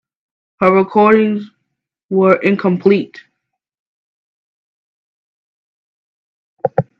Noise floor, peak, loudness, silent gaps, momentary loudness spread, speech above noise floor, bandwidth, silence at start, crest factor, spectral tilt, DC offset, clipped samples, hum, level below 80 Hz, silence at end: -75 dBFS; 0 dBFS; -14 LUFS; 2.03-2.09 s, 3.79-6.57 s; 11 LU; 63 dB; 5.8 kHz; 0.6 s; 18 dB; -9 dB/octave; under 0.1%; under 0.1%; none; -62 dBFS; 0.15 s